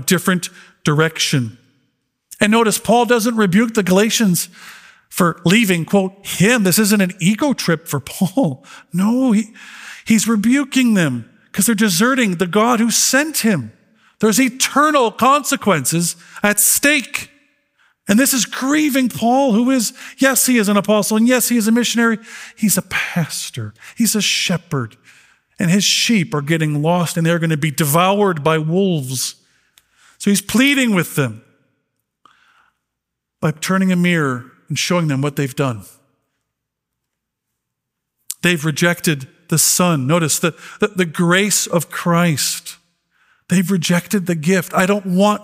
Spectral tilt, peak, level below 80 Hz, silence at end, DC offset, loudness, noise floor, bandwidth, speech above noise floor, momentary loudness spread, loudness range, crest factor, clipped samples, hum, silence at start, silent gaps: -4 dB/octave; 0 dBFS; -58 dBFS; 0 s; under 0.1%; -16 LUFS; -79 dBFS; 16 kHz; 63 dB; 10 LU; 5 LU; 16 dB; under 0.1%; none; 0 s; none